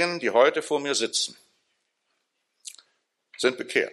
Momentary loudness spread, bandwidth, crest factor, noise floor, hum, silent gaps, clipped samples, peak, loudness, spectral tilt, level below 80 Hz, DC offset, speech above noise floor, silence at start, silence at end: 22 LU; 13 kHz; 22 dB; -76 dBFS; none; none; under 0.1%; -6 dBFS; -24 LUFS; -2 dB/octave; -78 dBFS; under 0.1%; 52 dB; 0 s; 0 s